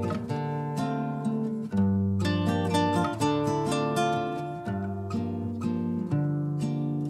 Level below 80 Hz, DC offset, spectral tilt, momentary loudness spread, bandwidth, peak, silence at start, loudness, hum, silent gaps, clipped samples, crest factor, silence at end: -62 dBFS; under 0.1%; -7 dB/octave; 7 LU; 13.5 kHz; -14 dBFS; 0 s; -28 LUFS; none; none; under 0.1%; 14 dB; 0 s